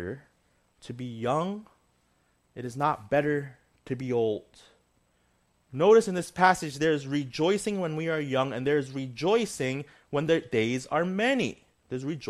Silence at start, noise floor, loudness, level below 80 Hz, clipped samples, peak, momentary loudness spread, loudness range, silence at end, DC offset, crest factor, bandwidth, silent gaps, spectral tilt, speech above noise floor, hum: 0 s; -69 dBFS; -27 LUFS; -64 dBFS; under 0.1%; -6 dBFS; 16 LU; 6 LU; 0 s; under 0.1%; 22 dB; 13.5 kHz; none; -5.5 dB/octave; 42 dB; none